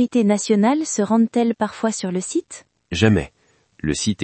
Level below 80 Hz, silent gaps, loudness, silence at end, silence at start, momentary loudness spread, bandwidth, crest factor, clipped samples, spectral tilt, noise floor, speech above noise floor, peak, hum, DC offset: -48 dBFS; none; -20 LUFS; 0 s; 0 s; 11 LU; 8.8 kHz; 20 dB; under 0.1%; -5 dB/octave; -56 dBFS; 37 dB; 0 dBFS; none; under 0.1%